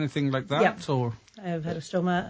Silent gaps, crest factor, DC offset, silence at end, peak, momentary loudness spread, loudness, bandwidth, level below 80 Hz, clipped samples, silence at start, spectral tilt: none; 18 dB; under 0.1%; 0 s; -8 dBFS; 9 LU; -28 LUFS; 8 kHz; -60 dBFS; under 0.1%; 0 s; -6.5 dB/octave